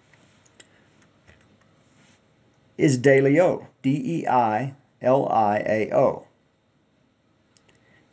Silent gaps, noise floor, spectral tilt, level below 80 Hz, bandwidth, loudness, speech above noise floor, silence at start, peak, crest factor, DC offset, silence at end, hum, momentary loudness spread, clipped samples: none; -65 dBFS; -7 dB/octave; -66 dBFS; 8 kHz; -21 LUFS; 44 dB; 2.8 s; -4 dBFS; 20 dB; under 0.1%; 1.95 s; none; 10 LU; under 0.1%